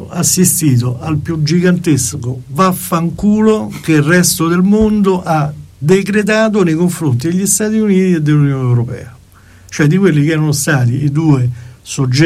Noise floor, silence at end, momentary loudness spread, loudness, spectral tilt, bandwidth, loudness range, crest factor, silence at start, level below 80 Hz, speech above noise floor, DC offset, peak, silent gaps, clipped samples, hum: -41 dBFS; 0 s; 8 LU; -12 LUFS; -5.5 dB/octave; 16 kHz; 2 LU; 12 dB; 0 s; -40 dBFS; 29 dB; under 0.1%; 0 dBFS; none; under 0.1%; none